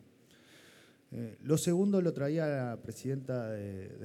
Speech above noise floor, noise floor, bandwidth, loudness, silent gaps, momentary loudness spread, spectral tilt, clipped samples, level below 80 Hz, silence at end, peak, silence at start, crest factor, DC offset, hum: 29 dB; -62 dBFS; 16 kHz; -34 LUFS; none; 15 LU; -6.5 dB/octave; under 0.1%; -74 dBFS; 0 s; -16 dBFS; 0.55 s; 18 dB; under 0.1%; none